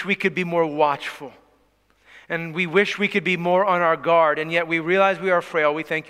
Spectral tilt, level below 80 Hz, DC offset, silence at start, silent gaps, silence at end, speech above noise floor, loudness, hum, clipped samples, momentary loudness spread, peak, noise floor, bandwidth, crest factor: -5.5 dB/octave; -68 dBFS; under 0.1%; 0 s; none; 0 s; 41 dB; -20 LUFS; none; under 0.1%; 10 LU; -4 dBFS; -62 dBFS; 15 kHz; 18 dB